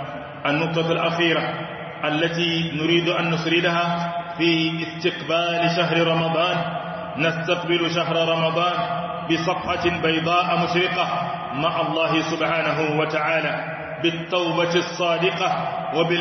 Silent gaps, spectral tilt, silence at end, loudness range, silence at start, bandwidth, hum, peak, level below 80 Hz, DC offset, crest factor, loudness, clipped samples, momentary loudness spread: none; -5.5 dB/octave; 0 s; 1 LU; 0 s; 6.4 kHz; none; -4 dBFS; -58 dBFS; under 0.1%; 16 dB; -21 LUFS; under 0.1%; 6 LU